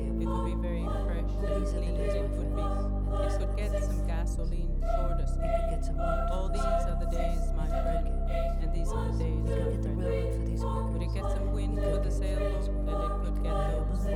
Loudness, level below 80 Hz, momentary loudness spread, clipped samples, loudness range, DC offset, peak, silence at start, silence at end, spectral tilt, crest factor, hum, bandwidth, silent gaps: -32 LUFS; -30 dBFS; 2 LU; under 0.1%; 1 LU; under 0.1%; -16 dBFS; 0 s; 0 s; -7.5 dB/octave; 12 dB; none; 11.5 kHz; none